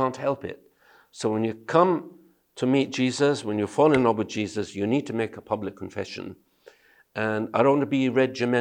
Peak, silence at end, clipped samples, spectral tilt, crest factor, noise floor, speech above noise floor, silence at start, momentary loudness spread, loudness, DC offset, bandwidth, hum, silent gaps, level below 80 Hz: -4 dBFS; 0 s; under 0.1%; -6 dB/octave; 20 dB; -55 dBFS; 31 dB; 0 s; 13 LU; -25 LUFS; under 0.1%; 10 kHz; none; none; -66 dBFS